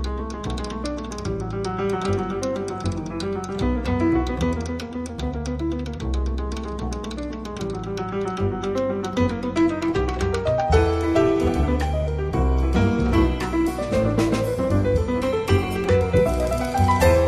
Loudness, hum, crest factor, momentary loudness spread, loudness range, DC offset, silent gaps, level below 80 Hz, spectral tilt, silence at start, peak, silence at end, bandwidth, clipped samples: -23 LUFS; none; 16 dB; 10 LU; 7 LU; under 0.1%; none; -28 dBFS; -7 dB/octave; 0 s; -6 dBFS; 0 s; 14 kHz; under 0.1%